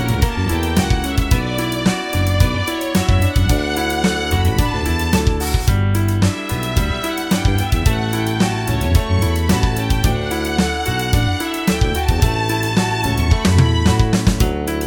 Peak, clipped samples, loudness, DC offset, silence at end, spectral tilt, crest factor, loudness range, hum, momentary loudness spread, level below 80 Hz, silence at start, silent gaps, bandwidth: 0 dBFS; under 0.1%; -17 LUFS; under 0.1%; 0 s; -5.5 dB/octave; 16 dB; 1 LU; none; 4 LU; -22 dBFS; 0 s; none; over 20 kHz